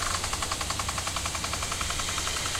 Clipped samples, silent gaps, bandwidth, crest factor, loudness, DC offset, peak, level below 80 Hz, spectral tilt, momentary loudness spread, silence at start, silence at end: under 0.1%; none; 16 kHz; 18 dB; -29 LUFS; under 0.1%; -14 dBFS; -40 dBFS; -1.5 dB/octave; 1 LU; 0 s; 0 s